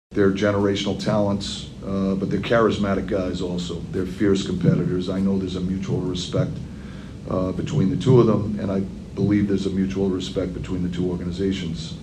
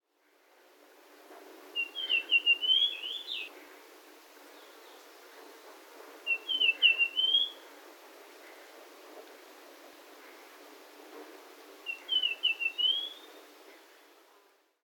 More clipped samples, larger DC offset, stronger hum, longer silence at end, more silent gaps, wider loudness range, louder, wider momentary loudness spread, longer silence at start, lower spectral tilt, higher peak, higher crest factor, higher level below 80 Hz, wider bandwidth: neither; neither; neither; second, 0 s vs 1.1 s; neither; second, 3 LU vs 21 LU; first, -23 LUFS vs -28 LUFS; second, 9 LU vs 28 LU; second, 0.1 s vs 1.3 s; first, -7 dB/octave vs 3.5 dB/octave; first, -4 dBFS vs -12 dBFS; second, 18 dB vs 24 dB; first, -42 dBFS vs under -90 dBFS; second, 9.8 kHz vs 18 kHz